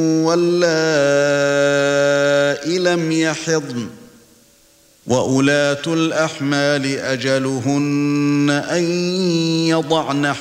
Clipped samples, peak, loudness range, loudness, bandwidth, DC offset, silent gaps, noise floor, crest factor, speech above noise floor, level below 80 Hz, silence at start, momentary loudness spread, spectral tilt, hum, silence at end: under 0.1%; -2 dBFS; 4 LU; -17 LUFS; 15.5 kHz; under 0.1%; none; -52 dBFS; 16 dB; 35 dB; -60 dBFS; 0 s; 5 LU; -5 dB/octave; none; 0 s